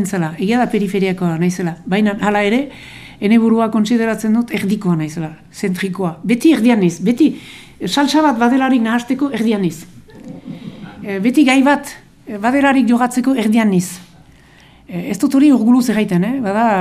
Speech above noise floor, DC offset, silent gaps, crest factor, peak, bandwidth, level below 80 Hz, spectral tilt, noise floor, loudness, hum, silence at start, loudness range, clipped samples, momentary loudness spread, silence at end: 30 dB; under 0.1%; none; 14 dB; 0 dBFS; 15 kHz; -52 dBFS; -6 dB/octave; -45 dBFS; -15 LUFS; none; 0 s; 3 LU; under 0.1%; 19 LU; 0 s